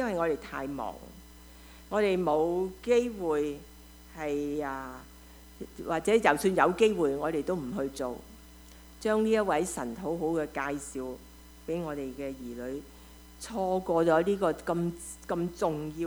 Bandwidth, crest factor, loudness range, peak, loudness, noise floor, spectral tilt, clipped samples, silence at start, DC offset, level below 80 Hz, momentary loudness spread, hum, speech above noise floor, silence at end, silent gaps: over 20 kHz; 24 dB; 7 LU; -8 dBFS; -30 LUFS; -51 dBFS; -5.5 dB/octave; under 0.1%; 0 s; under 0.1%; -54 dBFS; 19 LU; none; 22 dB; 0 s; none